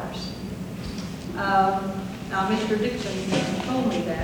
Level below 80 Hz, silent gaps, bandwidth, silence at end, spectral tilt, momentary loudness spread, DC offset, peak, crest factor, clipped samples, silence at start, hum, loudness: -46 dBFS; none; 20 kHz; 0 s; -5.5 dB/octave; 12 LU; under 0.1%; -8 dBFS; 16 dB; under 0.1%; 0 s; none; -26 LUFS